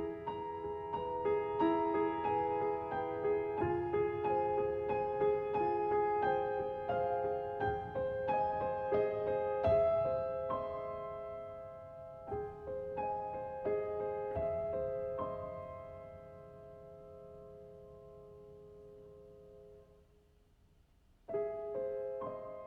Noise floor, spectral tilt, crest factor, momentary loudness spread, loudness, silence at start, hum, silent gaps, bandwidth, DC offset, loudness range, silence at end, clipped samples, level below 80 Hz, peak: -67 dBFS; -9 dB/octave; 18 dB; 21 LU; -36 LUFS; 0 s; none; none; 5.4 kHz; under 0.1%; 19 LU; 0 s; under 0.1%; -60 dBFS; -20 dBFS